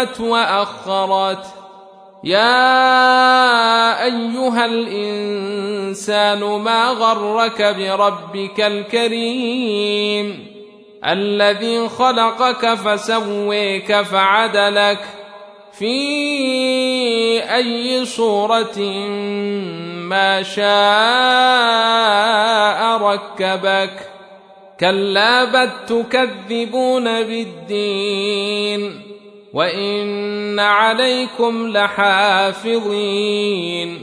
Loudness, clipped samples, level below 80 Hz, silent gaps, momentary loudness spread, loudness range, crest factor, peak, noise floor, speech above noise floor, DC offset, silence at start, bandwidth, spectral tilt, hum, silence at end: -16 LUFS; under 0.1%; -66 dBFS; none; 10 LU; 5 LU; 16 dB; -2 dBFS; -42 dBFS; 26 dB; under 0.1%; 0 s; 11 kHz; -3.5 dB/octave; none; 0 s